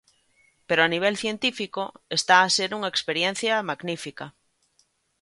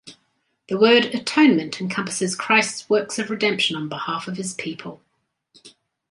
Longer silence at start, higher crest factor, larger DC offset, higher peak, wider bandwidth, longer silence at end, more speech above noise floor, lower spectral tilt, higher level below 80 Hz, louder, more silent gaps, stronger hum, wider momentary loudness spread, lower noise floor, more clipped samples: first, 0.7 s vs 0.05 s; about the same, 22 dB vs 20 dB; neither; about the same, -4 dBFS vs -2 dBFS; about the same, 11.5 kHz vs 11.5 kHz; first, 0.9 s vs 0.4 s; second, 43 dB vs 49 dB; about the same, -2.5 dB/octave vs -3.5 dB/octave; about the same, -70 dBFS vs -68 dBFS; second, -23 LUFS vs -20 LUFS; neither; neither; about the same, 15 LU vs 13 LU; about the same, -68 dBFS vs -70 dBFS; neither